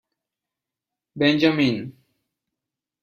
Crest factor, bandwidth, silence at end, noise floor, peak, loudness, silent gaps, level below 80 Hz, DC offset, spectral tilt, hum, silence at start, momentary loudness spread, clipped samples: 20 dB; 7 kHz; 1.1 s; -87 dBFS; -4 dBFS; -20 LUFS; none; -62 dBFS; under 0.1%; -6.5 dB/octave; none; 1.15 s; 14 LU; under 0.1%